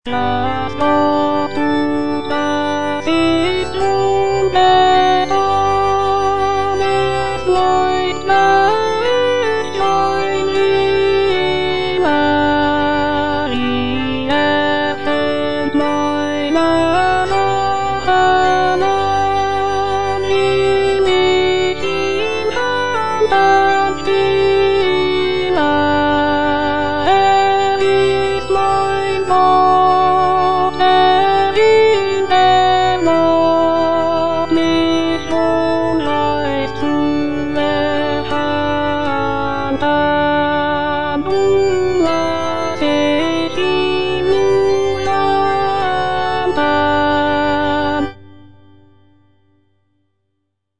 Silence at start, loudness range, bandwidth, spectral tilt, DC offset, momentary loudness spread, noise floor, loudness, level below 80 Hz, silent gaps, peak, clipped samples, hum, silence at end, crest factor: 0 s; 4 LU; 10 kHz; -5 dB/octave; 4%; 6 LU; -72 dBFS; -15 LUFS; -40 dBFS; none; -2 dBFS; under 0.1%; none; 0 s; 12 dB